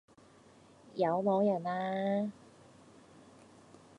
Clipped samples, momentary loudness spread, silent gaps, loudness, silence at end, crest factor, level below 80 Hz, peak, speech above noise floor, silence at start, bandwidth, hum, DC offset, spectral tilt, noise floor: under 0.1%; 8 LU; none; -33 LUFS; 1.65 s; 18 dB; -78 dBFS; -18 dBFS; 29 dB; 0.95 s; 10.5 kHz; none; under 0.1%; -8 dB/octave; -60 dBFS